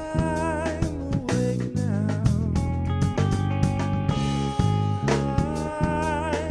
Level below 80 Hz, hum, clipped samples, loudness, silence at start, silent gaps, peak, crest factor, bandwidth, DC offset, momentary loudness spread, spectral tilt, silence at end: -36 dBFS; none; under 0.1%; -25 LUFS; 0 s; none; -8 dBFS; 16 dB; 11 kHz; under 0.1%; 3 LU; -7 dB/octave; 0 s